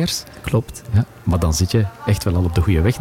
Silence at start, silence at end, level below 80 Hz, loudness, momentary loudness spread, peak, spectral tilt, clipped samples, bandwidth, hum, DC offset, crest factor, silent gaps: 0 s; 0 s; -32 dBFS; -19 LUFS; 5 LU; -6 dBFS; -5.5 dB/octave; under 0.1%; 16.5 kHz; none; under 0.1%; 12 dB; none